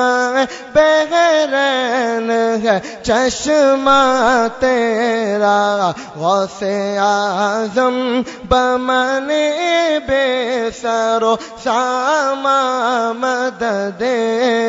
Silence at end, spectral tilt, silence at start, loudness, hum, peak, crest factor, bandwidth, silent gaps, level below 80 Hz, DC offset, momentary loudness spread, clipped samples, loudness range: 0 s; -3.5 dB/octave; 0 s; -15 LUFS; none; -2 dBFS; 14 dB; 7.8 kHz; none; -46 dBFS; under 0.1%; 6 LU; under 0.1%; 2 LU